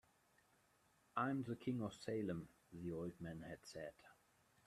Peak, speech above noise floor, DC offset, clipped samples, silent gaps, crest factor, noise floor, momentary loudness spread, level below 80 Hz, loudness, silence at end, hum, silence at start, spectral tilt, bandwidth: -26 dBFS; 30 dB; under 0.1%; under 0.1%; none; 22 dB; -77 dBFS; 11 LU; -76 dBFS; -47 LUFS; 0.55 s; none; 1.15 s; -7 dB/octave; 14 kHz